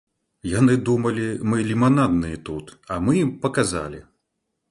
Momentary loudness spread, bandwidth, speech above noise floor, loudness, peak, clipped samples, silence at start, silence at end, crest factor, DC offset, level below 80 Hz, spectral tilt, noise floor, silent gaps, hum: 16 LU; 11.5 kHz; 56 dB; -21 LUFS; -4 dBFS; under 0.1%; 0.45 s; 0.7 s; 18 dB; under 0.1%; -46 dBFS; -6.5 dB/octave; -77 dBFS; none; none